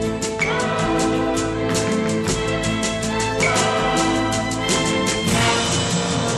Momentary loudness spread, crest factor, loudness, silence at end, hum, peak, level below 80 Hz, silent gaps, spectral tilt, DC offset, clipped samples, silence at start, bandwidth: 4 LU; 14 dB; -19 LUFS; 0 s; none; -6 dBFS; -38 dBFS; none; -4 dB/octave; under 0.1%; under 0.1%; 0 s; 13 kHz